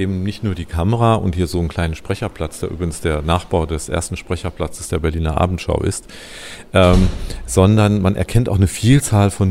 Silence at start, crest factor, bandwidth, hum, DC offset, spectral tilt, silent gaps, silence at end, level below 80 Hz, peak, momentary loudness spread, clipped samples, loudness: 0 s; 16 dB; 15.5 kHz; none; under 0.1%; -6 dB/octave; none; 0 s; -28 dBFS; 0 dBFS; 12 LU; under 0.1%; -18 LUFS